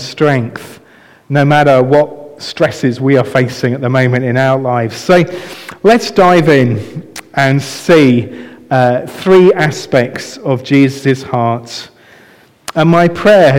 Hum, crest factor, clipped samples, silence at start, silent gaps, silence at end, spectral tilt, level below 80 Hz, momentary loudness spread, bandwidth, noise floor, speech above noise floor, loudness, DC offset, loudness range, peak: none; 10 dB; under 0.1%; 0 s; none; 0 s; -6.5 dB/octave; -48 dBFS; 15 LU; 16.5 kHz; -44 dBFS; 33 dB; -11 LUFS; under 0.1%; 2 LU; 0 dBFS